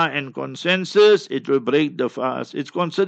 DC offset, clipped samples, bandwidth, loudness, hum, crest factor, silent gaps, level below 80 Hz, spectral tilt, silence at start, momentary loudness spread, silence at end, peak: under 0.1%; under 0.1%; 8.2 kHz; -20 LUFS; none; 16 dB; none; -74 dBFS; -5.5 dB/octave; 0 s; 12 LU; 0 s; -4 dBFS